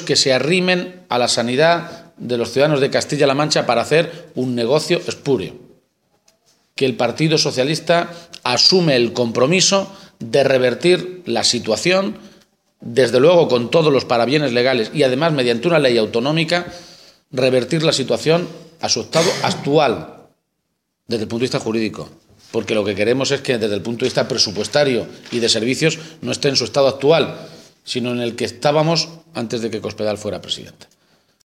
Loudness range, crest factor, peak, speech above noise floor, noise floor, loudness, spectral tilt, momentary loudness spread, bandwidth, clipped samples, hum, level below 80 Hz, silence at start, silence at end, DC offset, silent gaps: 6 LU; 18 dB; 0 dBFS; 56 dB; -73 dBFS; -17 LUFS; -4 dB/octave; 11 LU; 15 kHz; under 0.1%; none; -62 dBFS; 0 s; 0.9 s; under 0.1%; none